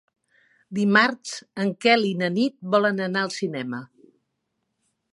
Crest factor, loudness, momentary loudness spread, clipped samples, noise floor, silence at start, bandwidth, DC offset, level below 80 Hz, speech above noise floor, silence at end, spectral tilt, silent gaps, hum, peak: 22 dB; -22 LUFS; 14 LU; under 0.1%; -77 dBFS; 0.7 s; 11.5 kHz; under 0.1%; -76 dBFS; 54 dB; 1.3 s; -5 dB/octave; none; none; -2 dBFS